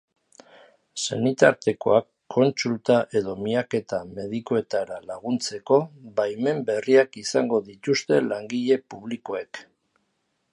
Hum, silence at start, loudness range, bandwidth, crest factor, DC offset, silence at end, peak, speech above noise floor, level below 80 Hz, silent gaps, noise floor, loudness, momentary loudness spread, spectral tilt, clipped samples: none; 0.95 s; 3 LU; 11 kHz; 22 dB; under 0.1%; 0.9 s; -2 dBFS; 50 dB; -66 dBFS; none; -73 dBFS; -24 LUFS; 12 LU; -5 dB/octave; under 0.1%